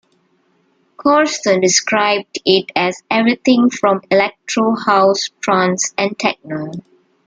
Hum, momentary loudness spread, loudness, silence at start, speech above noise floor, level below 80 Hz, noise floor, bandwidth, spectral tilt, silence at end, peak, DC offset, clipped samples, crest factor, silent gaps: none; 7 LU; -15 LUFS; 1 s; 44 dB; -62 dBFS; -59 dBFS; 9.6 kHz; -3.5 dB/octave; 0.45 s; 0 dBFS; under 0.1%; under 0.1%; 16 dB; none